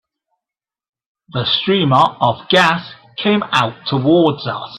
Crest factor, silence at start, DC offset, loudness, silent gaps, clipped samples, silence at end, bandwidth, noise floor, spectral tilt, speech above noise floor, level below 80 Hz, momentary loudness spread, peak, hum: 16 dB; 1.35 s; under 0.1%; -15 LUFS; none; under 0.1%; 0 s; 12.5 kHz; -87 dBFS; -6 dB/octave; 72 dB; -56 dBFS; 10 LU; 0 dBFS; none